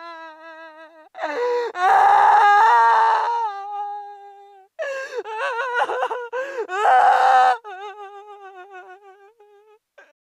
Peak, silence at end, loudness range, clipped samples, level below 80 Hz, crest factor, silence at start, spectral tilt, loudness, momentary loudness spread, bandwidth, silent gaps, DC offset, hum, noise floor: -4 dBFS; 1.35 s; 8 LU; under 0.1%; -72 dBFS; 16 dB; 0 s; -1 dB/octave; -18 LUFS; 24 LU; 12 kHz; none; under 0.1%; none; -54 dBFS